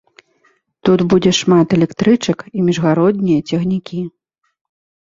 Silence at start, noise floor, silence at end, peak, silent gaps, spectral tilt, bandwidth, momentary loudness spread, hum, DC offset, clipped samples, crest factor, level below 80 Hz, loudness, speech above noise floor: 0.85 s; -59 dBFS; 0.95 s; 0 dBFS; none; -6 dB/octave; 7.6 kHz; 8 LU; none; under 0.1%; under 0.1%; 14 dB; -50 dBFS; -15 LUFS; 45 dB